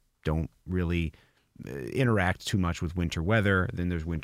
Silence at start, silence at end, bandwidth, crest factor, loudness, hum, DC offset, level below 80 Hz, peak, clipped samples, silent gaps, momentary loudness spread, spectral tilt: 0.25 s; 0 s; 15 kHz; 18 dB; -29 LUFS; none; under 0.1%; -42 dBFS; -12 dBFS; under 0.1%; none; 10 LU; -6.5 dB/octave